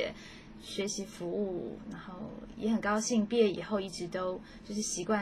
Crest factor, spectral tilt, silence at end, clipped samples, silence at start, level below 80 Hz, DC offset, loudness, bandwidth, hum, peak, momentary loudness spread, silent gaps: 18 dB; -4 dB/octave; 0 s; under 0.1%; 0 s; -60 dBFS; under 0.1%; -34 LUFS; 14 kHz; none; -16 dBFS; 15 LU; none